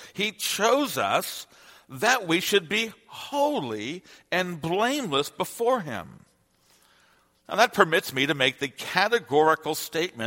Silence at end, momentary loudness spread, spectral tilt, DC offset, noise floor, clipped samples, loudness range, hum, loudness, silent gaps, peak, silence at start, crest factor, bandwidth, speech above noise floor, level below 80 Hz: 0 s; 12 LU; -3 dB/octave; under 0.1%; -64 dBFS; under 0.1%; 5 LU; none; -25 LUFS; none; -2 dBFS; 0 s; 24 dB; 16.5 kHz; 38 dB; -68 dBFS